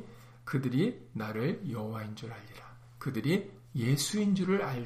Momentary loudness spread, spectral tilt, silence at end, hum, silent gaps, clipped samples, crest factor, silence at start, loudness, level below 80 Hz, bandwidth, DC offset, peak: 18 LU; -5.5 dB/octave; 0 s; none; none; under 0.1%; 16 dB; 0 s; -33 LUFS; -64 dBFS; 15.5 kHz; under 0.1%; -18 dBFS